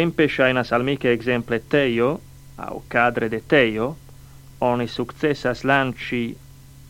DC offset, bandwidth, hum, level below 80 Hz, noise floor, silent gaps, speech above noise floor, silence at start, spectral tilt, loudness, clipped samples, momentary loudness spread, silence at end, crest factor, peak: under 0.1%; 17 kHz; none; -48 dBFS; -43 dBFS; none; 22 dB; 0 s; -6.5 dB/octave; -21 LUFS; under 0.1%; 13 LU; 0 s; 20 dB; -2 dBFS